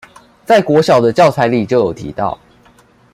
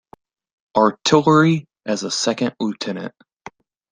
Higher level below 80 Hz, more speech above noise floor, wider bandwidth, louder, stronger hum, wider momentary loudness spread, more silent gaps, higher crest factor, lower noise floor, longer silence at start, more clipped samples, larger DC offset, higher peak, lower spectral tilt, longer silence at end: first, -48 dBFS vs -62 dBFS; first, 36 dB vs 25 dB; first, 15 kHz vs 10 kHz; first, -13 LUFS vs -18 LUFS; neither; about the same, 11 LU vs 13 LU; neither; about the same, 14 dB vs 18 dB; first, -48 dBFS vs -43 dBFS; second, 0.5 s vs 0.75 s; neither; neither; about the same, 0 dBFS vs -2 dBFS; about the same, -6 dB/octave vs -5 dB/octave; about the same, 0.8 s vs 0.85 s